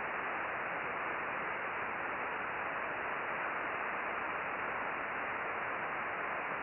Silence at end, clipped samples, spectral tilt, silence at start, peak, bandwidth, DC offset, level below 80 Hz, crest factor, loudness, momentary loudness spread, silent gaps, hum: 0 s; under 0.1%; -1.5 dB/octave; 0 s; -24 dBFS; 5.2 kHz; under 0.1%; -70 dBFS; 14 dB; -37 LUFS; 1 LU; none; none